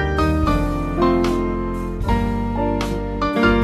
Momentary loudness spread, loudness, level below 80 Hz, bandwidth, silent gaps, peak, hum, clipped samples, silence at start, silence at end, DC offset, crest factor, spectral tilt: 6 LU; -20 LUFS; -26 dBFS; 14 kHz; none; -4 dBFS; none; under 0.1%; 0 s; 0 s; under 0.1%; 16 dB; -7 dB/octave